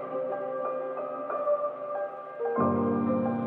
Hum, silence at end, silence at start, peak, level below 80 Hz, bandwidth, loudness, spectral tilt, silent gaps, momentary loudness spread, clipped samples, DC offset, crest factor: none; 0 s; 0 s; -14 dBFS; -78 dBFS; 3.8 kHz; -30 LUFS; -11 dB/octave; none; 8 LU; under 0.1%; under 0.1%; 14 dB